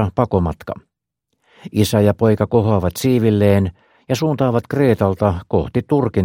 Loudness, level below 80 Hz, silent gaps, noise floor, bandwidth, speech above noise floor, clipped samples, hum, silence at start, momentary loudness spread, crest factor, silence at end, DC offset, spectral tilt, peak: -17 LUFS; -40 dBFS; none; -75 dBFS; 17 kHz; 59 dB; under 0.1%; none; 0 s; 9 LU; 16 dB; 0 s; under 0.1%; -7.5 dB/octave; 0 dBFS